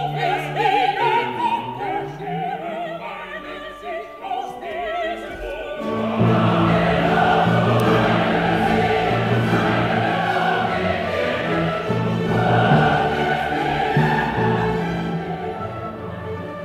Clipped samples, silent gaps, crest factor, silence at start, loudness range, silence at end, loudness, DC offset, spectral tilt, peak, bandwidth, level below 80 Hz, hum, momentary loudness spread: under 0.1%; none; 16 dB; 0 s; 10 LU; 0 s; -20 LUFS; under 0.1%; -7 dB/octave; -4 dBFS; 14.5 kHz; -44 dBFS; none; 13 LU